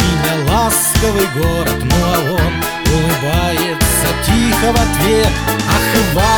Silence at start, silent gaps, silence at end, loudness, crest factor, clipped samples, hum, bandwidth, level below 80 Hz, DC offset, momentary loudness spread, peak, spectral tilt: 0 s; none; 0 s; -13 LUFS; 12 dB; under 0.1%; none; over 20 kHz; -22 dBFS; under 0.1%; 3 LU; 0 dBFS; -4 dB/octave